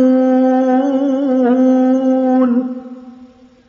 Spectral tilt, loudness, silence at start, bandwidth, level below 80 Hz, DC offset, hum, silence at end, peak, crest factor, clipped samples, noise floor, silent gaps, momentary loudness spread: -5.5 dB/octave; -13 LUFS; 0 s; 6.6 kHz; -66 dBFS; under 0.1%; none; 0.45 s; -2 dBFS; 10 dB; under 0.1%; -42 dBFS; none; 8 LU